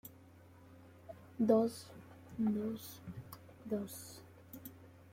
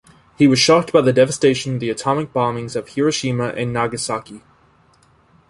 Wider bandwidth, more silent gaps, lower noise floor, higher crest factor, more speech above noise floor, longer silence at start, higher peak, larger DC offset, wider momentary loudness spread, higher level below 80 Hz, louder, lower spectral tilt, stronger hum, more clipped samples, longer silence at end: first, 16.5 kHz vs 11.5 kHz; neither; first, -60 dBFS vs -55 dBFS; about the same, 22 dB vs 18 dB; second, 24 dB vs 37 dB; second, 0.05 s vs 0.4 s; second, -18 dBFS vs -2 dBFS; neither; first, 25 LU vs 10 LU; second, -74 dBFS vs -54 dBFS; second, -37 LUFS vs -18 LUFS; first, -6.5 dB/octave vs -5 dB/octave; neither; neither; second, 0.05 s vs 1.1 s